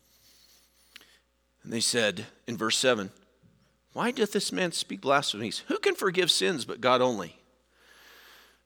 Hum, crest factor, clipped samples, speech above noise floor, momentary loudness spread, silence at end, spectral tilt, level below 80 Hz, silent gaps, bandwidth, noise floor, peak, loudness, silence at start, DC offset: none; 22 dB; under 0.1%; 39 dB; 13 LU; 1.35 s; -2.5 dB/octave; -74 dBFS; none; over 20 kHz; -67 dBFS; -8 dBFS; -27 LUFS; 1.65 s; under 0.1%